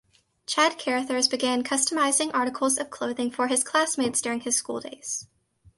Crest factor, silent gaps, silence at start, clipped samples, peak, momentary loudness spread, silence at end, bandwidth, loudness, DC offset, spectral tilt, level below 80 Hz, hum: 18 dB; none; 0.5 s; under 0.1%; -8 dBFS; 10 LU; 0.55 s; 12 kHz; -25 LUFS; under 0.1%; -1 dB/octave; -70 dBFS; none